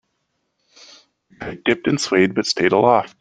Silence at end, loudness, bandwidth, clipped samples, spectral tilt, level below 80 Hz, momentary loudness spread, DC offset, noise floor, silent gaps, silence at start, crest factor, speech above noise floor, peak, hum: 0.1 s; -17 LUFS; 9.6 kHz; under 0.1%; -4.5 dB/octave; -58 dBFS; 11 LU; under 0.1%; -72 dBFS; none; 1.4 s; 18 dB; 54 dB; -2 dBFS; none